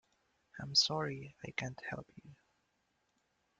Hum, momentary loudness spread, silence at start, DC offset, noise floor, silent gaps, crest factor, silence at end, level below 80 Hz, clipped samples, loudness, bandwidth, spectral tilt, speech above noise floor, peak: none; 18 LU; 0.55 s; under 0.1%; -80 dBFS; none; 24 dB; 1.25 s; -72 dBFS; under 0.1%; -35 LUFS; 9.6 kHz; -2.5 dB/octave; 43 dB; -18 dBFS